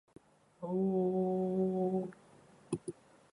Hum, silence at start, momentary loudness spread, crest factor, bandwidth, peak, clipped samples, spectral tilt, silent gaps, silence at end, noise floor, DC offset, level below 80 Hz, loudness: none; 0.6 s; 13 LU; 14 dB; 10.5 kHz; -22 dBFS; under 0.1%; -9 dB/octave; none; 0.4 s; -61 dBFS; under 0.1%; -74 dBFS; -35 LUFS